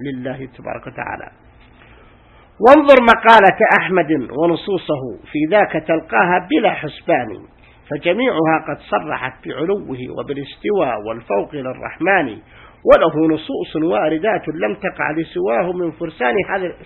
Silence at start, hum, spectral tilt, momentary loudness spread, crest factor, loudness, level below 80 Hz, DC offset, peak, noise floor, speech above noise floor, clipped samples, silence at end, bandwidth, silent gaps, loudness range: 0 s; none; -7 dB/octave; 18 LU; 16 dB; -16 LUFS; -48 dBFS; under 0.1%; 0 dBFS; -47 dBFS; 31 dB; 0.1%; 0 s; 8.6 kHz; none; 8 LU